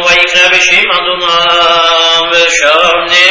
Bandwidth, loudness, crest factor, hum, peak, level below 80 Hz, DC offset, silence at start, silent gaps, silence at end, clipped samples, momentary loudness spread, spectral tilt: 8 kHz; -6 LUFS; 8 dB; none; 0 dBFS; -42 dBFS; under 0.1%; 0 s; none; 0 s; 1%; 4 LU; 0 dB/octave